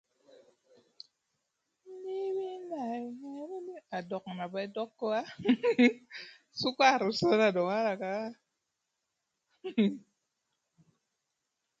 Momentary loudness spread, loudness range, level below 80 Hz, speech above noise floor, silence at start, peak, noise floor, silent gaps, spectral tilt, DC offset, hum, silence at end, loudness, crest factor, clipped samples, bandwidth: 18 LU; 12 LU; -76 dBFS; 55 dB; 1.85 s; -10 dBFS; -84 dBFS; none; -5.5 dB/octave; under 0.1%; none; 1.8 s; -31 LUFS; 22 dB; under 0.1%; 7.8 kHz